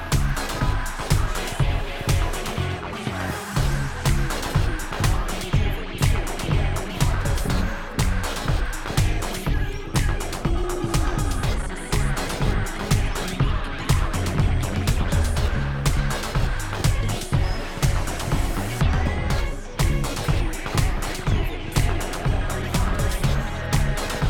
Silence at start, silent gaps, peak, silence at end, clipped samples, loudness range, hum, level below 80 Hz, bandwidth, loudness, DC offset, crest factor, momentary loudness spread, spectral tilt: 0 s; none; -4 dBFS; 0 s; under 0.1%; 2 LU; none; -26 dBFS; 18.5 kHz; -25 LUFS; under 0.1%; 18 dB; 4 LU; -5 dB/octave